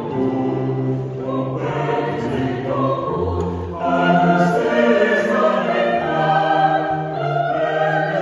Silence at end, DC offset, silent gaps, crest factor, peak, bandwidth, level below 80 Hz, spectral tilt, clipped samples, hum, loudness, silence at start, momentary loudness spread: 0 s; under 0.1%; none; 16 dB; -2 dBFS; 11 kHz; -46 dBFS; -7.5 dB/octave; under 0.1%; none; -19 LUFS; 0 s; 8 LU